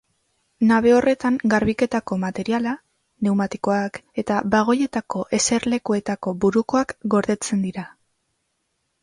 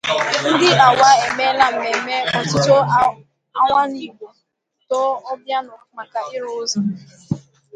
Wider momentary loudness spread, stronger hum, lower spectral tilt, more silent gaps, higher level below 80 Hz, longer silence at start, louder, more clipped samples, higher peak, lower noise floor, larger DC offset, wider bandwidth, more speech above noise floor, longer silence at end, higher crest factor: second, 9 LU vs 17 LU; neither; about the same, -5 dB/octave vs -4 dB/octave; neither; about the same, -54 dBFS vs -56 dBFS; first, 0.6 s vs 0.05 s; second, -21 LUFS vs -16 LUFS; neither; second, -6 dBFS vs 0 dBFS; about the same, -73 dBFS vs -70 dBFS; neither; about the same, 11.5 kHz vs 10.5 kHz; about the same, 53 dB vs 54 dB; first, 1.15 s vs 0.35 s; about the same, 16 dB vs 18 dB